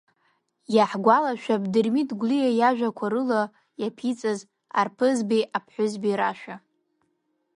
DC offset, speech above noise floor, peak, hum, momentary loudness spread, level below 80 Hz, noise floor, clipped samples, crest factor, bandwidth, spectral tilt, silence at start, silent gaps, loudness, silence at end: under 0.1%; 50 dB; -4 dBFS; none; 12 LU; -76 dBFS; -73 dBFS; under 0.1%; 22 dB; 11 kHz; -5.5 dB/octave; 0.7 s; none; -24 LUFS; 1 s